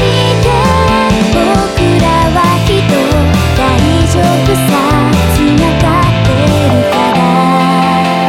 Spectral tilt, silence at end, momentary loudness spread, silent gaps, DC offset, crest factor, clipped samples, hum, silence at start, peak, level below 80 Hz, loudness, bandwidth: -6 dB/octave; 0 s; 1 LU; none; under 0.1%; 8 dB; under 0.1%; none; 0 s; 0 dBFS; -20 dBFS; -9 LUFS; 16.5 kHz